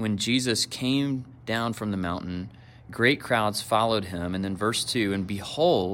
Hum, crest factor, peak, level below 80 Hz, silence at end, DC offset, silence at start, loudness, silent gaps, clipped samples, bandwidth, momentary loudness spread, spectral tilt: none; 18 dB; -8 dBFS; -58 dBFS; 0 s; under 0.1%; 0 s; -26 LUFS; none; under 0.1%; 16.5 kHz; 9 LU; -4.5 dB/octave